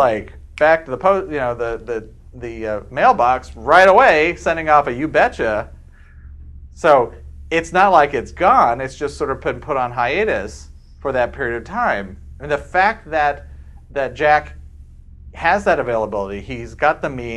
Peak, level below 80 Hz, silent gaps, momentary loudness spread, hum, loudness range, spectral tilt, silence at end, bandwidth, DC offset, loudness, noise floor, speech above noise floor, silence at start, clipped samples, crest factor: 0 dBFS; -38 dBFS; none; 15 LU; none; 6 LU; -5.5 dB/octave; 0 s; 11.5 kHz; under 0.1%; -17 LUFS; -41 dBFS; 24 dB; 0 s; under 0.1%; 18 dB